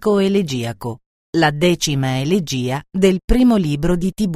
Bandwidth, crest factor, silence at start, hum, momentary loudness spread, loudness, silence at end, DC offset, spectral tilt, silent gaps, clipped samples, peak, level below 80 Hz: 16 kHz; 16 dB; 0 s; none; 9 LU; -17 LUFS; 0 s; under 0.1%; -5.5 dB/octave; 1.06-1.33 s, 3.24-3.28 s; under 0.1%; 0 dBFS; -30 dBFS